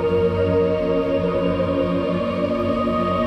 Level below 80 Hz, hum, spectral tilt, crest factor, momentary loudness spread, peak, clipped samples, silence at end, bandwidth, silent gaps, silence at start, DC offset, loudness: -40 dBFS; none; -8.5 dB/octave; 12 dB; 3 LU; -8 dBFS; under 0.1%; 0 s; 8.6 kHz; none; 0 s; under 0.1%; -20 LUFS